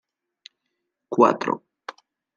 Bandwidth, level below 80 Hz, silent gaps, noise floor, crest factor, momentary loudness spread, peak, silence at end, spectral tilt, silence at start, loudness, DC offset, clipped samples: 7.2 kHz; -78 dBFS; none; -79 dBFS; 24 dB; 22 LU; -2 dBFS; 0.8 s; -6 dB/octave; 1.1 s; -22 LUFS; under 0.1%; under 0.1%